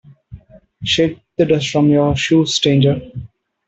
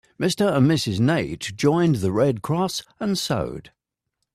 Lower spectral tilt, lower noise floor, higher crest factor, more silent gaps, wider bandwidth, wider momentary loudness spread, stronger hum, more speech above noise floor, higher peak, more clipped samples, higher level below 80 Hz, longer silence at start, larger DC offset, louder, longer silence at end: about the same, -5.5 dB/octave vs -6 dB/octave; second, -40 dBFS vs -79 dBFS; about the same, 14 dB vs 16 dB; neither; second, 8.2 kHz vs 14.5 kHz; first, 12 LU vs 8 LU; neither; second, 25 dB vs 58 dB; first, -2 dBFS vs -8 dBFS; neither; first, -44 dBFS vs -52 dBFS; about the same, 0.3 s vs 0.2 s; neither; first, -15 LUFS vs -22 LUFS; second, 0.4 s vs 0.65 s